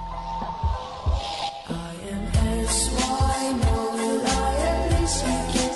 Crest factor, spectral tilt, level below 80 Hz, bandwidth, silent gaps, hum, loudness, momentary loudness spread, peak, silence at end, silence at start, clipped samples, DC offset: 14 dB; -4.5 dB/octave; -30 dBFS; 12 kHz; none; none; -25 LUFS; 9 LU; -10 dBFS; 0 s; 0 s; under 0.1%; under 0.1%